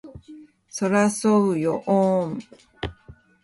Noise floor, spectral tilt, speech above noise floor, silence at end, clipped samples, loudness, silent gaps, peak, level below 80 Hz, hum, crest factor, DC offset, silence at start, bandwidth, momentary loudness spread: -50 dBFS; -6 dB/octave; 29 dB; 0.3 s; under 0.1%; -21 LUFS; none; -6 dBFS; -52 dBFS; none; 16 dB; under 0.1%; 0.05 s; 11.5 kHz; 16 LU